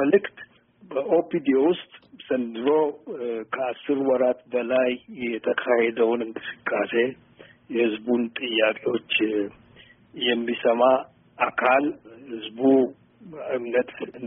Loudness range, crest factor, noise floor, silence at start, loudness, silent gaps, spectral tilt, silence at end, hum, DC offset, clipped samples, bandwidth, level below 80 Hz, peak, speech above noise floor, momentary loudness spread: 2 LU; 18 dB; -53 dBFS; 0 s; -24 LUFS; none; -0.5 dB/octave; 0 s; none; under 0.1%; under 0.1%; 3.8 kHz; -70 dBFS; -6 dBFS; 29 dB; 12 LU